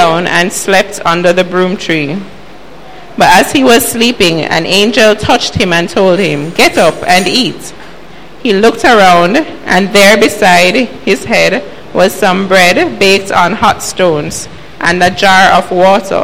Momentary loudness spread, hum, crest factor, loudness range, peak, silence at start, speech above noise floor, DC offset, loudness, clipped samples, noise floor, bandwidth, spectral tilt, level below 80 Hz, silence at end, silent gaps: 8 LU; none; 10 dB; 3 LU; 0 dBFS; 0 s; 24 dB; 5%; -8 LUFS; 0.6%; -32 dBFS; 17 kHz; -3.5 dB/octave; -38 dBFS; 0 s; none